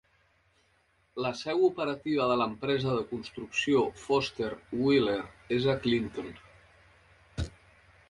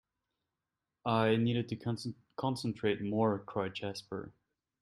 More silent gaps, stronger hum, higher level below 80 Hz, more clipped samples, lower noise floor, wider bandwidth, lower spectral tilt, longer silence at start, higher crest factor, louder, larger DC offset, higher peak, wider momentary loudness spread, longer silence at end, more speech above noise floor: neither; neither; first, -54 dBFS vs -70 dBFS; neither; second, -69 dBFS vs -89 dBFS; second, 11.5 kHz vs 13 kHz; about the same, -6 dB/octave vs -6.5 dB/octave; about the same, 1.15 s vs 1.05 s; about the same, 18 dB vs 20 dB; first, -30 LUFS vs -35 LUFS; neither; about the same, -14 dBFS vs -14 dBFS; about the same, 13 LU vs 13 LU; about the same, 0.6 s vs 0.5 s; second, 40 dB vs 56 dB